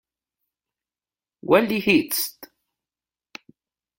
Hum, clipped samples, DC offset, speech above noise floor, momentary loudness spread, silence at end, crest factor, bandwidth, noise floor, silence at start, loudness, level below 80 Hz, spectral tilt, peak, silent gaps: none; under 0.1%; under 0.1%; over 70 dB; 10 LU; 1.55 s; 22 dB; 16.5 kHz; under -90 dBFS; 1.45 s; -20 LUFS; -64 dBFS; -4 dB/octave; -4 dBFS; none